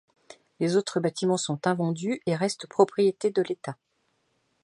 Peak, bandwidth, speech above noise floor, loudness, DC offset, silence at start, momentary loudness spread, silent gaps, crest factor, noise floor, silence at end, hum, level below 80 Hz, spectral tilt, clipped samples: -6 dBFS; 11.5 kHz; 47 dB; -26 LUFS; under 0.1%; 0.3 s; 8 LU; none; 22 dB; -73 dBFS; 0.9 s; none; -74 dBFS; -5.5 dB/octave; under 0.1%